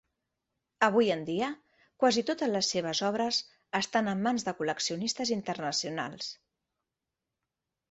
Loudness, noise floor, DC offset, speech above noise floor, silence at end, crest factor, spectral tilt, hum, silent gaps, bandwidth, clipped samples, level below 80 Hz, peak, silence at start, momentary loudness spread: -30 LUFS; -88 dBFS; under 0.1%; 58 dB; 1.6 s; 22 dB; -3.5 dB/octave; none; none; 8.2 kHz; under 0.1%; -72 dBFS; -10 dBFS; 0.8 s; 9 LU